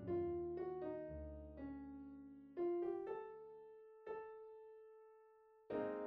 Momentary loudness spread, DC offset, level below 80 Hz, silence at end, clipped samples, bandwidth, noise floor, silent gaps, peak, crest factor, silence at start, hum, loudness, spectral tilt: 19 LU; under 0.1%; -66 dBFS; 0 s; under 0.1%; 4.1 kHz; -69 dBFS; none; -32 dBFS; 16 dB; 0 s; none; -48 LUFS; -8 dB/octave